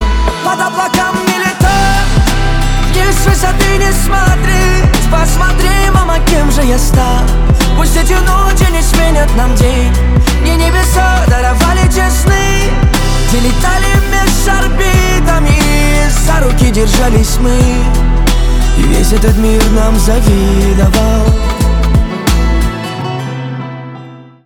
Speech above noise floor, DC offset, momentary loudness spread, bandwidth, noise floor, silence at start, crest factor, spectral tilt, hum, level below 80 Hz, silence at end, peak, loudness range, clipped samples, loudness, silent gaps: 23 dB; under 0.1%; 3 LU; 17.5 kHz; -31 dBFS; 0 s; 8 dB; -5 dB/octave; none; -10 dBFS; 0.25 s; 0 dBFS; 1 LU; under 0.1%; -11 LUFS; none